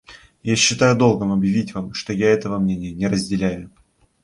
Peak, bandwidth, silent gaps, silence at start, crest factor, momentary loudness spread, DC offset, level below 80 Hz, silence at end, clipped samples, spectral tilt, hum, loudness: -2 dBFS; 11.5 kHz; none; 0.1 s; 18 dB; 11 LU; under 0.1%; -48 dBFS; 0.55 s; under 0.1%; -4.5 dB/octave; none; -19 LUFS